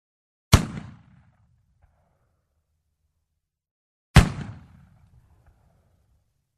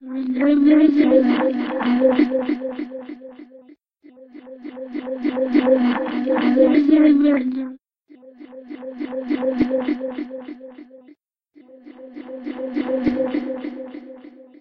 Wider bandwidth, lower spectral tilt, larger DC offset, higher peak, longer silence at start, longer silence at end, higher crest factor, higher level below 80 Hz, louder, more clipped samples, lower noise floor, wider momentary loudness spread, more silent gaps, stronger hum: first, 13.5 kHz vs 5.2 kHz; second, -5 dB/octave vs -8 dB/octave; neither; about the same, -2 dBFS vs -4 dBFS; first, 0.5 s vs 0 s; first, 2.1 s vs 0.2 s; first, 26 dB vs 16 dB; first, -32 dBFS vs -58 dBFS; about the same, -21 LUFS vs -19 LUFS; neither; first, -80 dBFS vs -53 dBFS; about the same, 21 LU vs 23 LU; first, 3.71-4.14 s vs none; neither